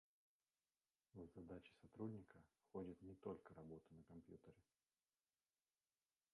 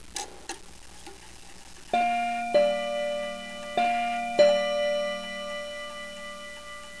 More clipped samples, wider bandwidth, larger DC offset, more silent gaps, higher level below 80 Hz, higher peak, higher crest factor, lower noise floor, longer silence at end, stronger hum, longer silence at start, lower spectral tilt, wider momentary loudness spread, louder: neither; about the same, 10 kHz vs 11 kHz; second, under 0.1% vs 0.4%; neither; second, -80 dBFS vs -56 dBFS; second, -40 dBFS vs -8 dBFS; about the same, 22 dB vs 20 dB; first, under -90 dBFS vs -48 dBFS; first, 1.7 s vs 0 s; second, none vs 60 Hz at -60 dBFS; first, 1.15 s vs 0 s; first, -8.5 dB/octave vs -2.5 dB/octave; second, 12 LU vs 23 LU; second, -59 LUFS vs -27 LUFS